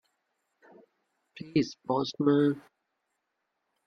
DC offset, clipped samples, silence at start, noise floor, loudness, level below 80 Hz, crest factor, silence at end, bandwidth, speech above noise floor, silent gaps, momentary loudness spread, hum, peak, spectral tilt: under 0.1%; under 0.1%; 1.35 s; -82 dBFS; -29 LUFS; -72 dBFS; 20 dB; 1.25 s; 7 kHz; 54 dB; none; 11 LU; none; -12 dBFS; -7 dB/octave